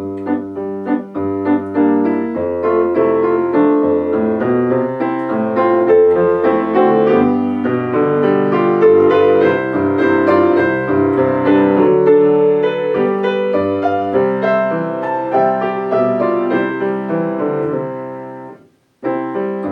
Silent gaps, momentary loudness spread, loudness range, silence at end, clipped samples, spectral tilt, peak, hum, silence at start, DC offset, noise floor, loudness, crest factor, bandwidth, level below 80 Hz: none; 9 LU; 4 LU; 0 s; under 0.1%; -9 dB/octave; 0 dBFS; none; 0 s; under 0.1%; -46 dBFS; -14 LUFS; 14 dB; 5.2 kHz; -56 dBFS